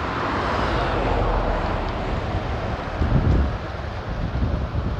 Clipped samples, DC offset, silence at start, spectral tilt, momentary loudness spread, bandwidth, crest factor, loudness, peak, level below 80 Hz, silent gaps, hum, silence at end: under 0.1%; under 0.1%; 0 s; -7.5 dB/octave; 7 LU; 8.2 kHz; 16 dB; -24 LUFS; -8 dBFS; -28 dBFS; none; none; 0 s